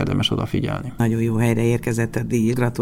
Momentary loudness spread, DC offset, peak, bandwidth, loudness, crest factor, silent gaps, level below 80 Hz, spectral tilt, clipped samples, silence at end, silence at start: 4 LU; under 0.1%; -4 dBFS; 16 kHz; -21 LUFS; 16 dB; none; -42 dBFS; -6 dB/octave; under 0.1%; 0 s; 0 s